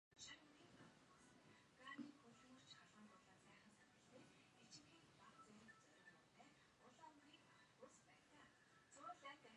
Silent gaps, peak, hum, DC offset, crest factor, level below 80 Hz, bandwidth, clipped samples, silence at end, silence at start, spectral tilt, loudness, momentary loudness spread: none; -44 dBFS; none; under 0.1%; 22 dB; under -90 dBFS; 10.5 kHz; under 0.1%; 0 s; 0.1 s; -3 dB/octave; -65 LUFS; 11 LU